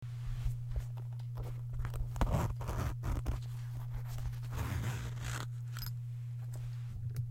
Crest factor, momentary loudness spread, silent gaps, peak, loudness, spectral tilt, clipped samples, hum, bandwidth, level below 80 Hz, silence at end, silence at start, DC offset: 20 dB; 6 LU; none; -18 dBFS; -40 LUFS; -6 dB/octave; under 0.1%; none; 16.5 kHz; -42 dBFS; 0 s; 0 s; under 0.1%